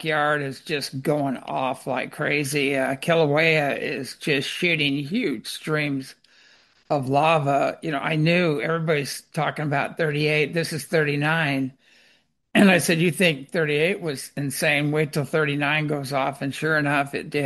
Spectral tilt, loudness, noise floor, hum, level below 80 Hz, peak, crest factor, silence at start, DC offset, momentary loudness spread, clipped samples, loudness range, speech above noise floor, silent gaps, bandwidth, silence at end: -5 dB/octave; -23 LUFS; -62 dBFS; none; -64 dBFS; -4 dBFS; 20 dB; 0 s; under 0.1%; 9 LU; under 0.1%; 3 LU; 39 dB; none; 12.5 kHz; 0 s